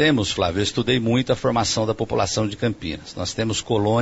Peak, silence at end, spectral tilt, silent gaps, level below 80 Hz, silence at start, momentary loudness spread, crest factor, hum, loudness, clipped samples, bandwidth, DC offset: -6 dBFS; 0 s; -4.5 dB/octave; none; -44 dBFS; 0 s; 7 LU; 16 dB; none; -22 LUFS; under 0.1%; 8 kHz; under 0.1%